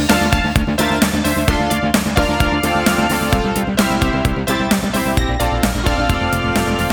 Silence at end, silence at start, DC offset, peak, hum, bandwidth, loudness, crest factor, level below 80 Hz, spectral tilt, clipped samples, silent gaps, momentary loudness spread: 0 s; 0 s; under 0.1%; -2 dBFS; none; over 20 kHz; -16 LUFS; 14 dB; -24 dBFS; -4.5 dB/octave; under 0.1%; none; 2 LU